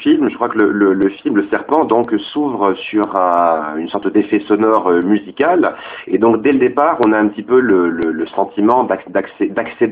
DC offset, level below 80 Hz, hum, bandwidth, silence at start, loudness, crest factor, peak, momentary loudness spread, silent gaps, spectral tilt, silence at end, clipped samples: under 0.1%; -54 dBFS; none; 4.7 kHz; 0 s; -15 LUFS; 14 dB; 0 dBFS; 6 LU; none; -9 dB/octave; 0 s; under 0.1%